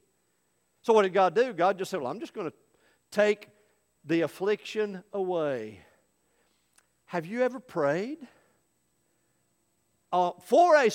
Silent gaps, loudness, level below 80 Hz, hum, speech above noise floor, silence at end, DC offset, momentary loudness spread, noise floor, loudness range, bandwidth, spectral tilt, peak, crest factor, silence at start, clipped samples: none; -28 LUFS; -80 dBFS; 60 Hz at -65 dBFS; 47 dB; 0 s; under 0.1%; 14 LU; -73 dBFS; 7 LU; 16.5 kHz; -5 dB/octave; -8 dBFS; 20 dB; 0.85 s; under 0.1%